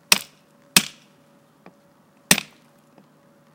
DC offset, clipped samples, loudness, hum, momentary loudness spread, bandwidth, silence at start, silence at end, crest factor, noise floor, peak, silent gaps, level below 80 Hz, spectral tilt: under 0.1%; under 0.1%; -19 LUFS; none; 22 LU; 17 kHz; 0.1 s; 1.15 s; 26 dB; -56 dBFS; 0 dBFS; none; -58 dBFS; -1 dB/octave